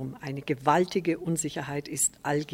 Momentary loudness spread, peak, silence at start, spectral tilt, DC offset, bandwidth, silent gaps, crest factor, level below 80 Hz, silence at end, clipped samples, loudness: 9 LU; -8 dBFS; 0 s; -4 dB/octave; under 0.1%; 16.5 kHz; none; 20 dB; -62 dBFS; 0 s; under 0.1%; -28 LUFS